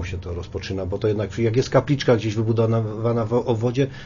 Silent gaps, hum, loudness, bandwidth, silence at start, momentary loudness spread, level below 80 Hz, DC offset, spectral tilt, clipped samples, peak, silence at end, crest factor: none; none; -22 LUFS; 7.4 kHz; 0 s; 10 LU; -44 dBFS; under 0.1%; -7 dB/octave; under 0.1%; -2 dBFS; 0 s; 20 dB